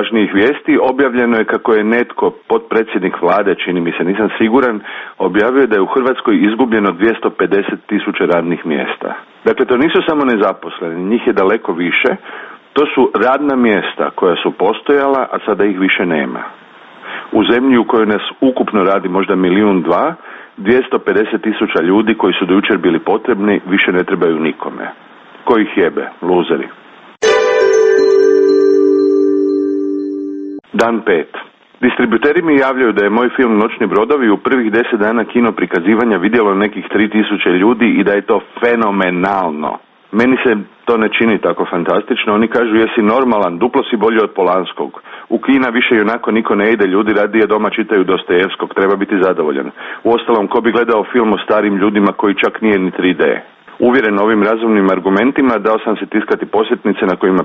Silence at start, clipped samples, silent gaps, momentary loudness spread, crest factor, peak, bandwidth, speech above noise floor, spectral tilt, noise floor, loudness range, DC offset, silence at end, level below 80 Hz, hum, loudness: 0 s; under 0.1%; none; 7 LU; 12 dB; 0 dBFS; 7.6 kHz; 23 dB; -6 dB/octave; -36 dBFS; 2 LU; under 0.1%; 0 s; -52 dBFS; none; -13 LUFS